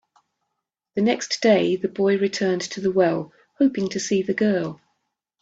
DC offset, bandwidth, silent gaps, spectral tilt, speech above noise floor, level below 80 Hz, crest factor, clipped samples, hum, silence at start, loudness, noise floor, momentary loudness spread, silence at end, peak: under 0.1%; 8 kHz; none; -5 dB/octave; 60 dB; -66 dBFS; 18 dB; under 0.1%; none; 0.95 s; -22 LUFS; -81 dBFS; 7 LU; 0.65 s; -4 dBFS